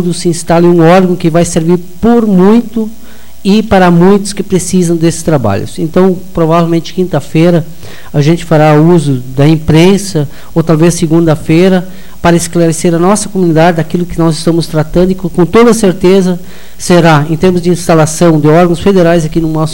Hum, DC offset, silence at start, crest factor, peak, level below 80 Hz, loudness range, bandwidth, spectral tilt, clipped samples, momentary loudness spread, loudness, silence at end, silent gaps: none; 9%; 0 s; 8 dB; 0 dBFS; -32 dBFS; 2 LU; 17 kHz; -6.5 dB/octave; under 0.1%; 8 LU; -8 LUFS; 0 s; none